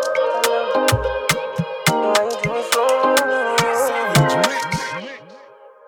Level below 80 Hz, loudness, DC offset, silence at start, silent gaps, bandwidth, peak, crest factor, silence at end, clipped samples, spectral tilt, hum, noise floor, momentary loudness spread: -44 dBFS; -18 LUFS; under 0.1%; 0 s; none; 19 kHz; 0 dBFS; 18 dB; 0.2 s; under 0.1%; -4 dB/octave; none; -44 dBFS; 8 LU